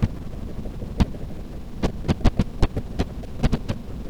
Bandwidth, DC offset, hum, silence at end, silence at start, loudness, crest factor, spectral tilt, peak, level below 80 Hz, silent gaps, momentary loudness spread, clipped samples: 13 kHz; under 0.1%; none; 0 s; 0 s; -27 LUFS; 22 dB; -7.5 dB/octave; -2 dBFS; -28 dBFS; none; 12 LU; under 0.1%